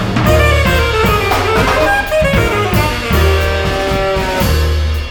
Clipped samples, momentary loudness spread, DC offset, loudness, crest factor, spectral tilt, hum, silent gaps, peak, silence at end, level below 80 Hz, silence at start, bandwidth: under 0.1%; 4 LU; under 0.1%; -13 LUFS; 12 dB; -5 dB/octave; none; none; 0 dBFS; 0 s; -18 dBFS; 0 s; over 20 kHz